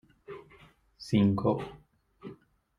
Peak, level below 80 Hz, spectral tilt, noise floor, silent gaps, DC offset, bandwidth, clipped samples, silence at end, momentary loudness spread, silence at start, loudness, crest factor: -12 dBFS; -62 dBFS; -8 dB/octave; -59 dBFS; none; under 0.1%; 11 kHz; under 0.1%; 0.45 s; 23 LU; 0.3 s; -28 LUFS; 20 dB